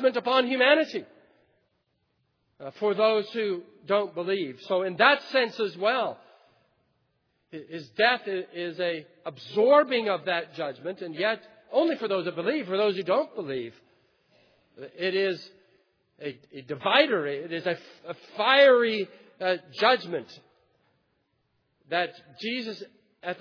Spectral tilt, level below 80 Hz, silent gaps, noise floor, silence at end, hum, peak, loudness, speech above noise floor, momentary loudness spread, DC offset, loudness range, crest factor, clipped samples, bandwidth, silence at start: -5.5 dB/octave; -86 dBFS; none; -74 dBFS; 0.05 s; none; -4 dBFS; -26 LUFS; 48 dB; 19 LU; under 0.1%; 7 LU; 22 dB; under 0.1%; 5.4 kHz; 0 s